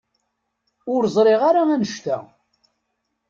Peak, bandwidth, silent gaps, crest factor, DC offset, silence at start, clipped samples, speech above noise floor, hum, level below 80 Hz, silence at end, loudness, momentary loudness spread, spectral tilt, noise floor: -6 dBFS; 7.6 kHz; none; 16 dB; under 0.1%; 0.85 s; under 0.1%; 57 dB; none; -66 dBFS; 1.05 s; -19 LUFS; 12 LU; -6 dB/octave; -75 dBFS